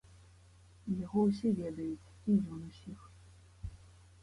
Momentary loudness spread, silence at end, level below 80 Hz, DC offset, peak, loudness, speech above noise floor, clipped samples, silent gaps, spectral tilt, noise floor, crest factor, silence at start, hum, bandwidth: 19 LU; 0.35 s; -58 dBFS; under 0.1%; -20 dBFS; -35 LUFS; 26 dB; under 0.1%; none; -9 dB/octave; -60 dBFS; 18 dB; 0.1 s; none; 11 kHz